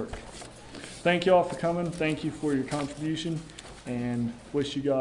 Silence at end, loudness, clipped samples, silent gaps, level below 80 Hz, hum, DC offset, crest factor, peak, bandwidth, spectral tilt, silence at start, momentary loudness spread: 0 s; -29 LUFS; under 0.1%; none; -54 dBFS; none; under 0.1%; 20 dB; -10 dBFS; 11 kHz; -6 dB/octave; 0 s; 19 LU